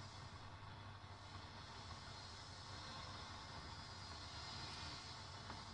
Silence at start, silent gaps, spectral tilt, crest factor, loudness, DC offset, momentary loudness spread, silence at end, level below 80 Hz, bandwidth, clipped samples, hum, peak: 0 s; none; -3.5 dB/octave; 14 dB; -53 LUFS; under 0.1%; 6 LU; 0 s; -66 dBFS; 11 kHz; under 0.1%; none; -38 dBFS